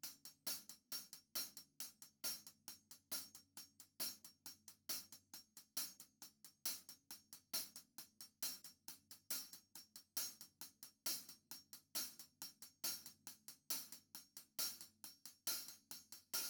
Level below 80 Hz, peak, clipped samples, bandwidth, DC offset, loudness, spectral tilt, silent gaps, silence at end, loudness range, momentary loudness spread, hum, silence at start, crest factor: under -90 dBFS; -28 dBFS; under 0.1%; over 20 kHz; under 0.1%; -49 LUFS; 1 dB/octave; none; 0 s; 2 LU; 13 LU; none; 0.05 s; 24 dB